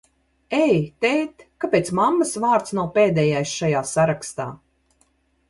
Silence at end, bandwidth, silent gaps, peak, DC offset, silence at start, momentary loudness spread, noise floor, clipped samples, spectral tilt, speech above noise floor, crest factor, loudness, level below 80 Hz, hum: 0.95 s; 11.5 kHz; none; -6 dBFS; under 0.1%; 0.5 s; 11 LU; -64 dBFS; under 0.1%; -5.5 dB/octave; 44 dB; 16 dB; -21 LUFS; -56 dBFS; none